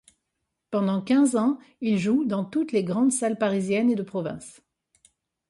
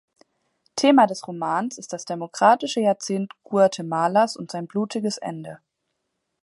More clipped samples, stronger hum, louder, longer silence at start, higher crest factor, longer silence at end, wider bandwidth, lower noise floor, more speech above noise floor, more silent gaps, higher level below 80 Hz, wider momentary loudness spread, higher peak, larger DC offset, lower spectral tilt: neither; neither; about the same, -24 LUFS vs -22 LUFS; about the same, 0.7 s vs 0.75 s; second, 14 dB vs 20 dB; about the same, 1 s vs 0.9 s; about the same, 11.5 kHz vs 11.5 kHz; first, -81 dBFS vs -77 dBFS; about the same, 57 dB vs 56 dB; neither; first, -68 dBFS vs -76 dBFS; second, 10 LU vs 14 LU; second, -12 dBFS vs -4 dBFS; neither; about the same, -5.5 dB/octave vs -4.5 dB/octave